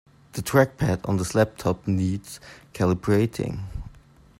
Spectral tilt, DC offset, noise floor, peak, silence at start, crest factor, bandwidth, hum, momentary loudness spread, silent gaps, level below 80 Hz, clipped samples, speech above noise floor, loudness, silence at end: -6.5 dB/octave; under 0.1%; -51 dBFS; -4 dBFS; 0.35 s; 22 dB; 16 kHz; none; 17 LU; none; -46 dBFS; under 0.1%; 28 dB; -24 LUFS; 0.45 s